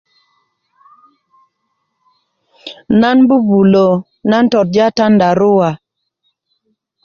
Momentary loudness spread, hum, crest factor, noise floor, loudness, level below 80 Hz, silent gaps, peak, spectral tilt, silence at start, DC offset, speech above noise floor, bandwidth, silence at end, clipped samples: 16 LU; none; 12 dB; -69 dBFS; -11 LUFS; -52 dBFS; none; -2 dBFS; -7.5 dB/octave; 2.65 s; under 0.1%; 59 dB; 7 kHz; 1.3 s; under 0.1%